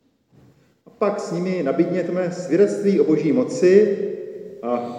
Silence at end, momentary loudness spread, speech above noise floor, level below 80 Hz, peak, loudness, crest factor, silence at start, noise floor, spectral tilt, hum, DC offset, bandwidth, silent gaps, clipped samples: 0 s; 11 LU; 36 dB; -76 dBFS; -2 dBFS; -20 LUFS; 18 dB; 1 s; -55 dBFS; -7 dB/octave; none; under 0.1%; 10 kHz; none; under 0.1%